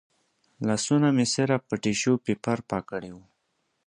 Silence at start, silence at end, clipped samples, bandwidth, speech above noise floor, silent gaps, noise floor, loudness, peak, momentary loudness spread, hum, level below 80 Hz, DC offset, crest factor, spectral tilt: 0.6 s; 0.7 s; under 0.1%; 11 kHz; 50 dB; none; -75 dBFS; -26 LUFS; -8 dBFS; 11 LU; none; -62 dBFS; under 0.1%; 18 dB; -5 dB/octave